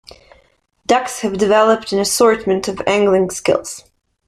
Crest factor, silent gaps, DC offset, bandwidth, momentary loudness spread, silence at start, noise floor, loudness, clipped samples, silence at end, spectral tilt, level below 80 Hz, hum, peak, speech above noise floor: 16 dB; none; under 0.1%; 15.5 kHz; 9 LU; 0.9 s; -56 dBFS; -15 LUFS; under 0.1%; 0.5 s; -3.5 dB/octave; -50 dBFS; none; 0 dBFS; 41 dB